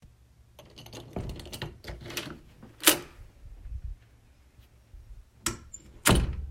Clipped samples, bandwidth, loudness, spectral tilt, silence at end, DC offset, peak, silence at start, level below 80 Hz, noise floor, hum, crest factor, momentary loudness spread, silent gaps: under 0.1%; 16 kHz; -29 LUFS; -3 dB/octave; 0 s; under 0.1%; -2 dBFS; 0.05 s; -40 dBFS; -58 dBFS; none; 30 dB; 26 LU; none